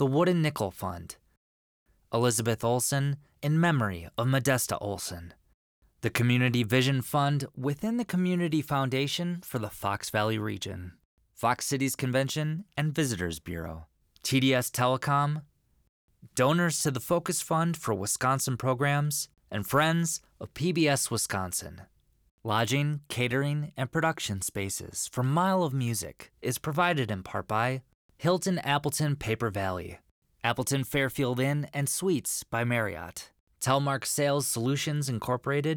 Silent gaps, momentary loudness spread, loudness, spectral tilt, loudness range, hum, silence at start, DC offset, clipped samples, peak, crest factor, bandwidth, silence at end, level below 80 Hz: 1.37-1.86 s, 5.54-5.82 s, 11.05-11.17 s, 15.89-16.08 s, 22.31-22.38 s, 27.94-28.09 s, 30.11-30.22 s, 33.40-33.47 s; 10 LU; -29 LUFS; -4.5 dB/octave; 3 LU; none; 0 s; under 0.1%; under 0.1%; -10 dBFS; 18 dB; over 20 kHz; 0 s; -60 dBFS